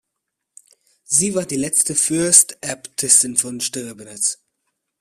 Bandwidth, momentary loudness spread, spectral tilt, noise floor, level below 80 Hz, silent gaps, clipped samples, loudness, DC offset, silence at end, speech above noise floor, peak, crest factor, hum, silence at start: 16 kHz; 15 LU; -2 dB/octave; -79 dBFS; -60 dBFS; none; under 0.1%; -16 LUFS; under 0.1%; 0.65 s; 60 dB; 0 dBFS; 20 dB; none; 1.1 s